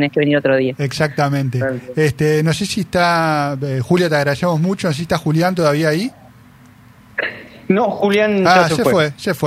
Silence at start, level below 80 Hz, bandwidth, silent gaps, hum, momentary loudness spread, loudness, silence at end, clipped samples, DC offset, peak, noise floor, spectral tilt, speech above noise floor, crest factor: 0 s; -50 dBFS; 15.5 kHz; none; none; 8 LU; -16 LUFS; 0 s; under 0.1%; under 0.1%; 0 dBFS; -44 dBFS; -6 dB/octave; 29 dB; 16 dB